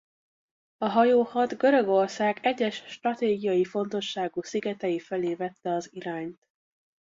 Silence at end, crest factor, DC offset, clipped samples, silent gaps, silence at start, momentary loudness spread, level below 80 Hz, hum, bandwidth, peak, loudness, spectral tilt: 0.7 s; 18 dB; under 0.1%; under 0.1%; none; 0.8 s; 10 LU; -72 dBFS; none; 7.8 kHz; -10 dBFS; -27 LUFS; -5.5 dB/octave